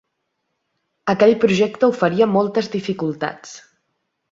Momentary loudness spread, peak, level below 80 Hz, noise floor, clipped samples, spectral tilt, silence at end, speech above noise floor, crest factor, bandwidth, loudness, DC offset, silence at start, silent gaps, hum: 13 LU; -2 dBFS; -60 dBFS; -74 dBFS; under 0.1%; -6 dB/octave; 0.7 s; 56 dB; 18 dB; 7.8 kHz; -18 LUFS; under 0.1%; 1.05 s; none; none